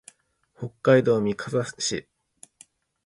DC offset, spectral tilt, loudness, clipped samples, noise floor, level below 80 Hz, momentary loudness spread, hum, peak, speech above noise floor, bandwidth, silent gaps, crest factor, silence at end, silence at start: under 0.1%; -5 dB/octave; -24 LUFS; under 0.1%; -64 dBFS; -62 dBFS; 17 LU; none; -6 dBFS; 41 dB; 11.5 kHz; none; 22 dB; 1.05 s; 0.6 s